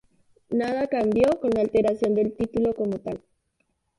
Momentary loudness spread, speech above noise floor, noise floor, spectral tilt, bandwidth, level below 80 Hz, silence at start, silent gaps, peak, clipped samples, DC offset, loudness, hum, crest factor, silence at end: 8 LU; 50 dB; -73 dBFS; -7.5 dB/octave; 11.5 kHz; -54 dBFS; 0.5 s; none; -8 dBFS; under 0.1%; under 0.1%; -24 LUFS; none; 16 dB; 0.8 s